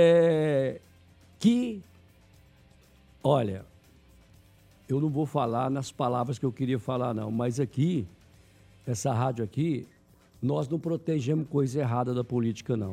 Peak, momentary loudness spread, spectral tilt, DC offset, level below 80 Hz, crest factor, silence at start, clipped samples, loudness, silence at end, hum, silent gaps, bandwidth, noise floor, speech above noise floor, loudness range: -10 dBFS; 9 LU; -7 dB/octave; under 0.1%; -64 dBFS; 18 dB; 0 s; under 0.1%; -28 LUFS; 0 s; none; none; 14 kHz; -59 dBFS; 32 dB; 3 LU